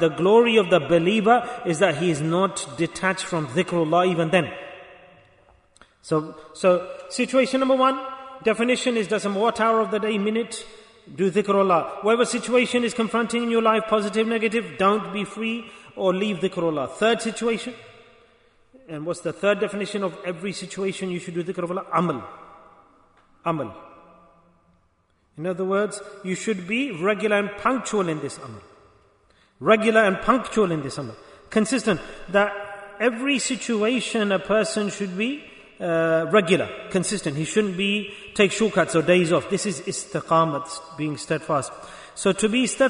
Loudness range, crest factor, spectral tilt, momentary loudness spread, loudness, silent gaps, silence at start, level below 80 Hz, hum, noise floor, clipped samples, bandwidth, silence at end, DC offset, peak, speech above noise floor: 7 LU; 20 dB; -4.5 dB/octave; 12 LU; -23 LUFS; none; 0 s; -58 dBFS; none; -65 dBFS; under 0.1%; 10.5 kHz; 0 s; under 0.1%; -4 dBFS; 42 dB